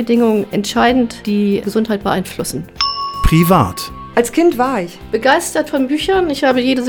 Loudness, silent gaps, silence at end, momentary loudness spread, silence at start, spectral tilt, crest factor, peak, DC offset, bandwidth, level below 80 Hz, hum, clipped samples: -15 LUFS; none; 0 s; 6 LU; 0 s; -5 dB/octave; 14 dB; 0 dBFS; under 0.1%; over 20 kHz; -30 dBFS; none; under 0.1%